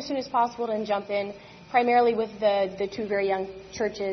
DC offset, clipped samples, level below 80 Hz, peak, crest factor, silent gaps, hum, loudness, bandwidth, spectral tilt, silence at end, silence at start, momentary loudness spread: under 0.1%; under 0.1%; -60 dBFS; -8 dBFS; 18 dB; none; none; -26 LUFS; 6.4 kHz; -5 dB/octave; 0 s; 0 s; 9 LU